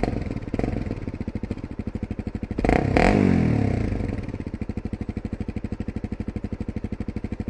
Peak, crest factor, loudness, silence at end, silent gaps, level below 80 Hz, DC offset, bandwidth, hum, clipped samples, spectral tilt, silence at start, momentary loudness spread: 0 dBFS; 24 dB; -26 LUFS; 0 s; none; -34 dBFS; under 0.1%; 11 kHz; none; under 0.1%; -8 dB/octave; 0 s; 13 LU